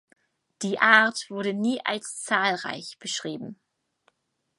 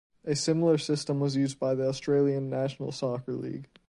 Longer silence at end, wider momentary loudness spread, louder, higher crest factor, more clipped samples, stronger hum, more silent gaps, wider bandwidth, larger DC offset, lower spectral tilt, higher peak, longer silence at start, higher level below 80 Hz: first, 1.05 s vs 0.25 s; first, 17 LU vs 8 LU; first, -24 LUFS vs -29 LUFS; first, 24 dB vs 16 dB; neither; neither; neither; about the same, 11.5 kHz vs 11.5 kHz; neither; second, -3 dB/octave vs -6 dB/octave; first, -2 dBFS vs -12 dBFS; first, 0.6 s vs 0.25 s; second, -80 dBFS vs -66 dBFS